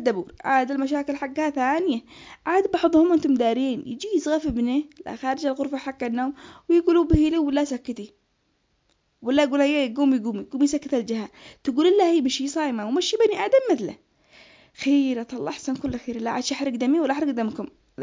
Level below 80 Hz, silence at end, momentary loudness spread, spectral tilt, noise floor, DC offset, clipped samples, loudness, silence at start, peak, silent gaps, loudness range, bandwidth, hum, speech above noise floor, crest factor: -44 dBFS; 0 s; 12 LU; -5 dB/octave; -69 dBFS; under 0.1%; under 0.1%; -23 LUFS; 0 s; -6 dBFS; none; 3 LU; 7.6 kHz; none; 47 dB; 18 dB